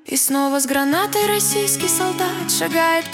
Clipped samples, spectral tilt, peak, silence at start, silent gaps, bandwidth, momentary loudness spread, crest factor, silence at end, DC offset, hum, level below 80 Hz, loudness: under 0.1%; -2 dB/octave; -4 dBFS; 0.05 s; none; 18 kHz; 3 LU; 16 dB; 0 s; under 0.1%; none; -62 dBFS; -18 LUFS